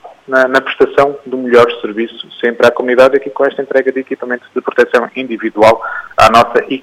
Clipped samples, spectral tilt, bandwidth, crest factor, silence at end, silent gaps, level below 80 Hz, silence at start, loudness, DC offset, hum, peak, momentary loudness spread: 0.2%; -4.5 dB/octave; 15.5 kHz; 12 dB; 0 s; none; -46 dBFS; 0.05 s; -12 LUFS; under 0.1%; none; 0 dBFS; 11 LU